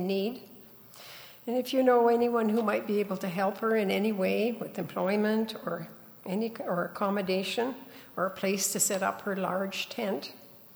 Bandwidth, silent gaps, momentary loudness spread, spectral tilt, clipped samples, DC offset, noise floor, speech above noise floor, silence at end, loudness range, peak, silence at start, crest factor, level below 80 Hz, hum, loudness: over 20 kHz; none; 18 LU; -4 dB/octave; under 0.1%; under 0.1%; -51 dBFS; 22 dB; 0.05 s; 4 LU; -14 dBFS; 0 s; 16 dB; -76 dBFS; none; -29 LUFS